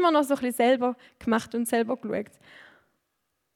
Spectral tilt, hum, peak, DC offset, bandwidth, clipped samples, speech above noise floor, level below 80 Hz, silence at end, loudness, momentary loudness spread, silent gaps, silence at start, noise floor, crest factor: -4 dB/octave; none; -10 dBFS; under 0.1%; 17 kHz; under 0.1%; 52 dB; -66 dBFS; 1.3 s; -26 LUFS; 11 LU; none; 0 s; -78 dBFS; 18 dB